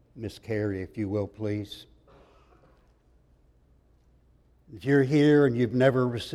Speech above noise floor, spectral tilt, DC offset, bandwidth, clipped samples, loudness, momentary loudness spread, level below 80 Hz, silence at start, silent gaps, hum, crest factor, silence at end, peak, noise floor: 37 dB; -7.5 dB/octave; under 0.1%; 12.5 kHz; under 0.1%; -25 LUFS; 18 LU; -60 dBFS; 0.15 s; none; none; 20 dB; 0 s; -8 dBFS; -62 dBFS